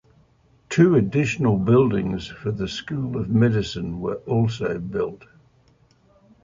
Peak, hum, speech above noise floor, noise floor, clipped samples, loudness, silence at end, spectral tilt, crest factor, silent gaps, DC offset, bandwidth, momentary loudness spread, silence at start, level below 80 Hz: -4 dBFS; none; 37 dB; -58 dBFS; under 0.1%; -22 LUFS; 1.25 s; -7.5 dB/octave; 18 dB; none; under 0.1%; 7.6 kHz; 11 LU; 0.7 s; -48 dBFS